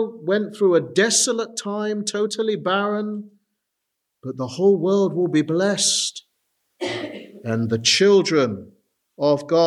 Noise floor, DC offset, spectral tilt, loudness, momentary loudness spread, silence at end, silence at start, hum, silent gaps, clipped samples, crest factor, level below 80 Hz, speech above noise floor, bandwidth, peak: -79 dBFS; under 0.1%; -3.5 dB/octave; -20 LUFS; 14 LU; 0 s; 0 s; none; none; under 0.1%; 18 dB; -74 dBFS; 59 dB; 13 kHz; -4 dBFS